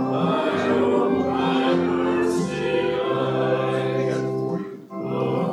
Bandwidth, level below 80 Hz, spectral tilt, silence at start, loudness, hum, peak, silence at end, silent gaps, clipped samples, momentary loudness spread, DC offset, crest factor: 12 kHz; -58 dBFS; -6.5 dB/octave; 0 s; -22 LUFS; none; -8 dBFS; 0 s; none; under 0.1%; 6 LU; under 0.1%; 14 dB